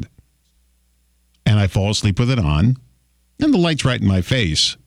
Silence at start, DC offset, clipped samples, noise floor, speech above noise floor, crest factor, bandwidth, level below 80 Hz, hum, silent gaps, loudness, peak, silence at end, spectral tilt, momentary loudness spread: 0 s; under 0.1%; under 0.1%; -60 dBFS; 44 dB; 14 dB; 13.5 kHz; -36 dBFS; none; none; -18 LUFS; -6 dBFS; 0.15 s; -5.5 dB/octave; 5 LU